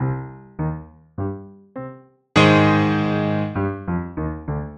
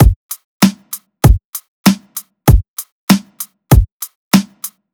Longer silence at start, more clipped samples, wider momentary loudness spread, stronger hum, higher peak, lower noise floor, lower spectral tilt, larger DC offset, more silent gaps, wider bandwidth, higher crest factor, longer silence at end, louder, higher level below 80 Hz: about the same, 0 s vs 0 s; neither; first, 22 LU vs 16 LU; neither; about the same, -2 dBFS vs 0 dBFS; first, -41 dBFS vs -32 dBFS; first, -7 dB/octave vs -5.5 dB/octave; neither; second, none vs 0.16-0.29 s, 0.44-0.60 s, 1.44-1.53 s, 1.68-1.84 s, 2.68-2.77 s, 2.92-3.07 s, 3.92-4.00 s, 4.15-4.31 s; second, 9 kHz vs over 20 kHz; first, 20 dB vs 14 dB; second, 0 s vs 0.25 s; second, -20 LUFS vs -14 LUFS; second, -44 dBFS vs -20 dBFS